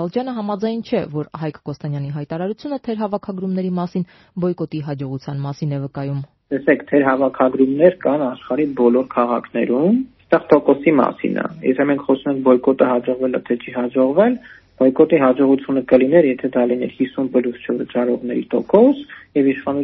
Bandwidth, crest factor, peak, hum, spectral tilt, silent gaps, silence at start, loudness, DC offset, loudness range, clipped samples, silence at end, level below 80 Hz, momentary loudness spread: 6 kHz; 18 dB; 0 dBFS; none; -7 dB/octave; none; 0 s; -18 LUFS; under 0.1%; 8 LU; under 0.1%; 0 s; -58 dBFS; 12 LU